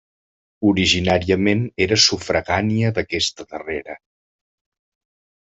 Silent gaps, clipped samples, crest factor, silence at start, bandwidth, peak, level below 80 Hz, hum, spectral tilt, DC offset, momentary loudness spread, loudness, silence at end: none; under 0.1%; 18 dB; 0.6 s; 8.2 kHz; -2 dBFS; -50 dBFS; none; -4 dB/octave; under 0.1%; 14 LU; -18 LUFS; 1.45 s